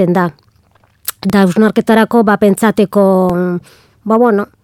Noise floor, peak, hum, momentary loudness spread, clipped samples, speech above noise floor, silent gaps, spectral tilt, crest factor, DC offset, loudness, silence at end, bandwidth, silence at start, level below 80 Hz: -52 dBFS; 0 dBFS; none; 11 LU; under 0.1%; 41 dB; none; -6.5 dB/octave; 12 dB; under 0.1%; -11 LUFS; 0.2 s; 17.5 kHz; 0 s; -48 dBFS